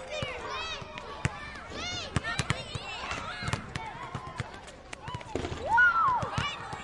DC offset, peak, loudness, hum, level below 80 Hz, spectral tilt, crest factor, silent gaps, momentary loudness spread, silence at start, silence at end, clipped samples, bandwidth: under 0.1%; -8 dBFS; -31 LUFS; none; -50 dBFS; -4 dB/octave; 24 dB; none; 17 LU; 0 s; 0 s; under 0.1%; 11.5 kHz